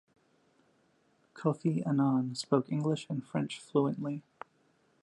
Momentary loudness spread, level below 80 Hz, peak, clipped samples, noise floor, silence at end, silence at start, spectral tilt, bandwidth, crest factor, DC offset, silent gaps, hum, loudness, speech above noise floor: 12 LU; -80 dBFS; -14 dBFS; under 0.1%; -70 dBFS; 0.8 s; 1.35 s; -7 dB/octave; 11.5 kHz; 20 dB; under 0.1%; none; none; -32 LUFS; 39 dB